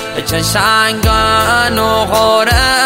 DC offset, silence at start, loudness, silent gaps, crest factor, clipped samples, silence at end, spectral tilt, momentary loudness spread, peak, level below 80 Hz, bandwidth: under 0.1%; 0 s; -11 LUFS; none; 12 dB; under 0.1%; 0 s; -3.5 dB/octave; 3 LU; 0 dBFS; -24 dBFS; 16.5 kHz